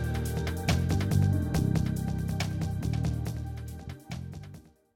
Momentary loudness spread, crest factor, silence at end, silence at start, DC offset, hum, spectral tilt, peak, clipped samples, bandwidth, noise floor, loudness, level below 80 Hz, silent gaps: 14 LU; 16 dB; 0.35 s; 0 s; under 0.1%; none; -6.5 dB/octave; -14 dBFS; under 0.1%; 17 kHz; -50 dBFS; -30 LUFS; -40 dBFS; none